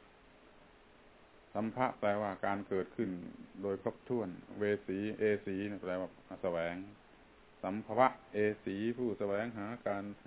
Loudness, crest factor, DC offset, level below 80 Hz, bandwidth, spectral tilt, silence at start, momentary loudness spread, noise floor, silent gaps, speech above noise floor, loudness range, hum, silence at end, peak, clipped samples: -37 LUFS; 26 dB; under 0.1%; -68 dBFS; 4 kHz; -5.5 dB/octave; 0.55 s; 9 LU; -62 dBFS; none; 25 dB; 2 LU; none; 0.1 s; -12 dBFS; under 0.1%